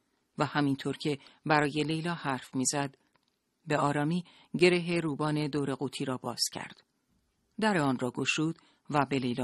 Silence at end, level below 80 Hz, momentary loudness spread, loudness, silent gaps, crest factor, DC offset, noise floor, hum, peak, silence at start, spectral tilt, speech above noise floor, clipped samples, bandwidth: 0 s; -68 dBFS; 9 LU; -31 LUFS; none; 22 dB; under 0.1%; -74 dBFS; none; -10 dBFS; 0.4 s; -4.5 dB/octave; 44 dB; under 0.1%; 12.5 kHz